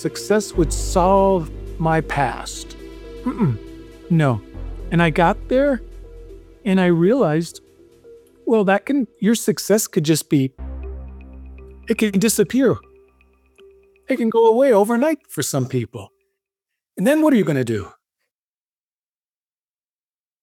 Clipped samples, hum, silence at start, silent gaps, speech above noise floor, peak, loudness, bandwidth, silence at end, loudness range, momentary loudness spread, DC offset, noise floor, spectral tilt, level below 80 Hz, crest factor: under 0.1%; none; 0 s; none; over 72 dB; -2 dBFS; -19 LUFS; 18.5 kHz; 2.55 s; 3 LU; 19 LU; under 0.1%; under -90 dBFS; -5.5 dB/octave; -36 dBFS; 18 dB